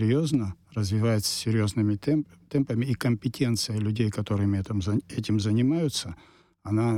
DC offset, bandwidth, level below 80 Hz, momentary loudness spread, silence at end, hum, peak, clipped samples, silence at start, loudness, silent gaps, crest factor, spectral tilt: under 0.1%; 15.5 kHz; -56 dBFS; 6 LU; 0 s; none; -12 dBFS; under 0.1%; 0 s; -27 LUFS; none; 14 dB; -6 dB/octave